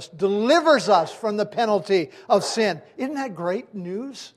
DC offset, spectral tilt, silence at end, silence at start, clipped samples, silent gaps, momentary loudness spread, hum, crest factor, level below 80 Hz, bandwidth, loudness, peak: under 0.1%; -4.5 dB/octave; 0.1 s; 0 s; under 0.1%; none; 13 LU; none; 18 dB; -74 dBFS; 14 kHz; -22 LUFS; -4 dBFS